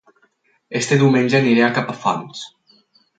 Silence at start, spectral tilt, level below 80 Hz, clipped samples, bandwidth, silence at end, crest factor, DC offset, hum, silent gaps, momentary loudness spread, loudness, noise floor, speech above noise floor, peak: 0.7 s; -5.5 dB/octave; -64 dBFS; under 0.1%; 9.2 kHz; 0.7 s; 16 dB; under 0.1%; none; none; 19 LU; -17 LUFS; -62 dBFS; 45 dB; -2 dBFS